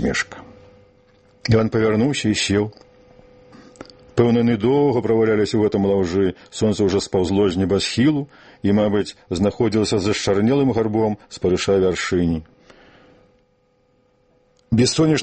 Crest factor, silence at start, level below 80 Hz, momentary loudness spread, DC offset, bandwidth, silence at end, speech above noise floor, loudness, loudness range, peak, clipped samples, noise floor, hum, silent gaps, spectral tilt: 18 dB; 0 s; -46 dBFS; 7 LU; under 0.1%; 8.8 kHz; 0 s; 43 dB; -19 LUFS; 4 LU; -2 dBFS; under 0.1%; -61 dBFS; none; none; -5.5 dB/octave